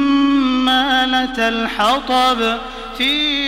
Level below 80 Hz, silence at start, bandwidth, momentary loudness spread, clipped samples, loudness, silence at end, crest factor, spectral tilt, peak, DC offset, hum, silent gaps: -40 dBFS; 0 s; 16 kHz; 5 LU; under 0.1%; -15 LUFS; 0 s; 14 dB; -3 dB/octave; -2 dBFS; under 0.1%; none; none